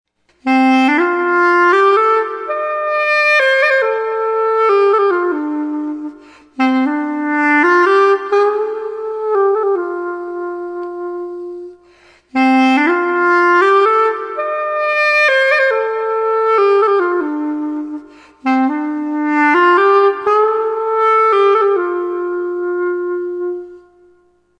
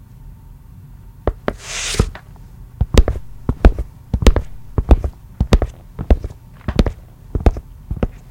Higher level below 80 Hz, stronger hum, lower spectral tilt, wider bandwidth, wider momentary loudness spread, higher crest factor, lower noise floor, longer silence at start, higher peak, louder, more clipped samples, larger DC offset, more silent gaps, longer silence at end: second, -64 dBFS vs -20 dBFS; first, 60 Hz at -65 dBFS vs none; second, -3.5 dB/octave vs -6 dB/octave; second, 11 kHz vs 16 kHz; second, 13 LU vs 20 LU; second, 12 dB vs 18 dB; first, -53 dBFS vs -39 dBFS; first, 0.45 s vs 0.25 s; about the same, -2 dBFS vs 0 dBFS; first, -14 LUFS vs -20 LUFS; second, under 0.1% vs 0.3%; neither; neither; first, 0.8 s vs 0.1 s